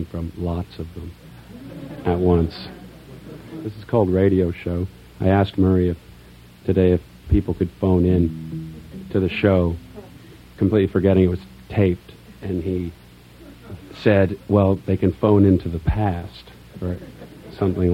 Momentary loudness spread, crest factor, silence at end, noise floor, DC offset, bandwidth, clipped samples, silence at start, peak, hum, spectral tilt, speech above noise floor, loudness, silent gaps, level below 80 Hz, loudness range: 21 LU; 20 dB; 0 s; -45 dBFS; under 0.1%; 5.8 kHz; under 0.1%; 0 s; -2 dBFS; 60 Hz at -45 dBFS; -9.5 dB/octave; 26 dB; -20 LUFS; none; -38 dBFS; 4 LU